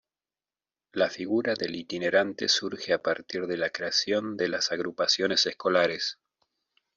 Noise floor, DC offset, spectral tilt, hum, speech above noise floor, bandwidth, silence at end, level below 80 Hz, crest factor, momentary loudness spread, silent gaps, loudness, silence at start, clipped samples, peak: under -90 dBFS; under 0.1%; -2.5 dB/octave; none; over 62 dB; 7.8 kHz; 0.85 s; -72 dBFS; 20 dB; 7 LU; none; -27 LUFS; 0.95 s; under 0.1%; -10 dBFS